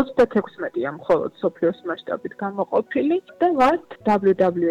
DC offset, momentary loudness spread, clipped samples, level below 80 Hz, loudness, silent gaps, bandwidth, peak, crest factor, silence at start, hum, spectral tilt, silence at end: under 0.1%; 10 LU; under 0.1%; -56 dBFS; -22 LUFS; none; 9.8 kHz; -8 dBFS; 12 dB; 0 s; none; -7.5 dB/octave; 0 s